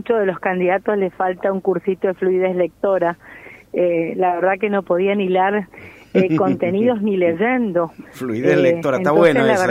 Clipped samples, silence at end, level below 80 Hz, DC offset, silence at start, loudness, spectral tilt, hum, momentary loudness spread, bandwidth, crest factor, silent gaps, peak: under 0.1%; 0 s; -58 dBFS; under 0.1%; 0.05 s; -18 LUFS; -7 dB/octave; none; 7 LU; 13.5 kHz; 16 dB; none; -2 dBFS